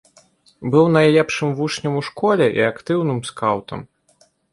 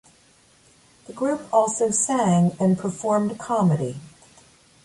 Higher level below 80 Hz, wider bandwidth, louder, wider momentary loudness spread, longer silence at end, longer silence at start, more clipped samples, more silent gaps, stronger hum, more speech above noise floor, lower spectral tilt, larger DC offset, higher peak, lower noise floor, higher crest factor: about the same, -58 dBFS vs -62 dBFS; about the same, 11.5 kHz vs 11.5 kHz; first, -18 LUFS vs -22 LUFS; first, 11 LU vs 8 LU; about the same, 0.65 s vs 0.75 s; second, 0.6 s vs 1.1 s; neither; neither; neither; first, 40 dB vs 35 dB; about the same, -6 dB/octave vs -6 dB/octave; neither; first, -2 dBFS vs -6 dBFS; about the same, -58 dBFS vs -57 dBFS; about the same, 16 dB vs 18 dB